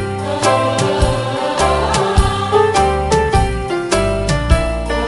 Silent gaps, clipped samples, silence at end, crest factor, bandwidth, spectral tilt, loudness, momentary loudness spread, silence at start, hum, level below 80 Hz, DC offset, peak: none; under 0.1%; 0 s; 14 dB; 11.5 kHz; -5 dB/octave; -15 LUFS; 5 LU; 0 s; none; -22 dBFS; under 0.1%; 0 dBFS